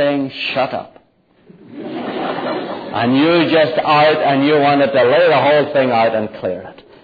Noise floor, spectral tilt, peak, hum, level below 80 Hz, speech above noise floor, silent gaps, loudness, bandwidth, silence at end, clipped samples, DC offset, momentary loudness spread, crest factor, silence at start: -53 dBFS; -8 dB/octave; -2 dBFS; none; -60 dBFS; 40 dB; none; -14 LUFS; 5 kHz; 0.3 s; under 0.1%; under 0.1%; 13 LU; 14 dB; 0 s